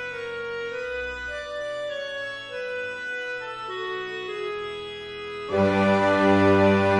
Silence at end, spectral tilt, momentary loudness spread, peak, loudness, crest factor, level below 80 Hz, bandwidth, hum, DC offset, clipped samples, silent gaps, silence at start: 0 s; -6.5 dB/octave; 14 LU; -6 dBFS; -26 LUFS; 18 dB; -56 dBFS; 10.5 kHz; none; under 0.1%; under 0.1%; none; 0 s